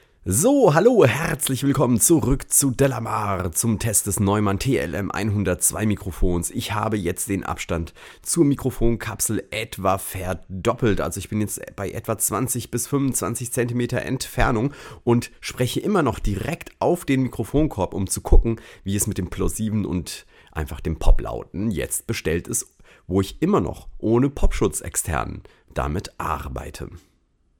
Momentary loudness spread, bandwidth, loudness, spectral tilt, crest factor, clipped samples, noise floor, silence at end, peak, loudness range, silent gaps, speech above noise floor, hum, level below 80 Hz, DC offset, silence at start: 11 LU; 18.5 kHz; -22 LUFS; -5 dB/octave; 20 dB; under 0.1%; -63 dBFS; 0.6 s; -2 dBFS; 6 LU; none; 42 dB; none; -30 dBFS; under 0.1%; 0.25 s